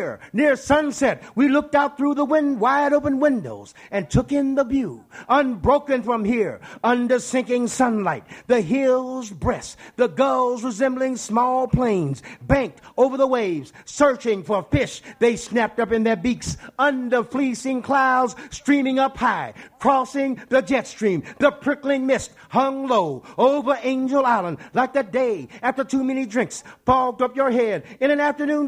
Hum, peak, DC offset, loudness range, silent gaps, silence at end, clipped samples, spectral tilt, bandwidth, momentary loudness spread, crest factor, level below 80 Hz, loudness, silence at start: none; -2 dBFS; under 0.1%; 2 LU; none; 0 s; under 0.1%; -5.5 dB/octave; 11.5 kHz; 7 LU; 18 dB; -46 dBFS; -21 LUFS; 0 s